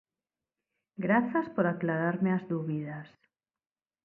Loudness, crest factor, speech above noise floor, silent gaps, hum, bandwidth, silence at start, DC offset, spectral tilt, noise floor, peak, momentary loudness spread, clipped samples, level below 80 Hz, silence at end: -30 LUFS; 20 dB; over 60 dB; none; none; 4.3 kHz; 1 s; under 0.1%; -11 dB/octave; under -90 dBFS; -12 dBFS; 13 LU; under 0.1%; -76 dBFS; 0.95 s